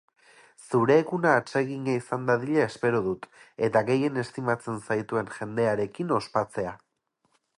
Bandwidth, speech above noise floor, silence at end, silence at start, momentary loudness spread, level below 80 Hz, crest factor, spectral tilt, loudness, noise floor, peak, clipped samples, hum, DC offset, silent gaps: 11.5 kHz; 47 dB; 0.8 s; 0.6 s; 9 LU; -64 dBFS; 20 dB; -6.5 dB/octave; -27 LUFS; -73 dBFS; -8 dBFS; under 0.1%; none; under 0.1%; none